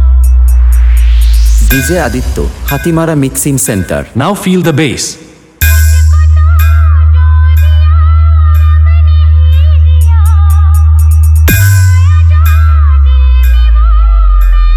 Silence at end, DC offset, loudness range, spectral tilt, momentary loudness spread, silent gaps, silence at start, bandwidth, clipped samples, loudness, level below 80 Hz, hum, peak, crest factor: 0 s; under 0.1%; 4 LU; -6 dB/octave; 5 LU; none; 0 s; 16.5 kHz; under 0.1%; -7 LUFS; -6 dBFS; none; 0 dBFS; 4 dB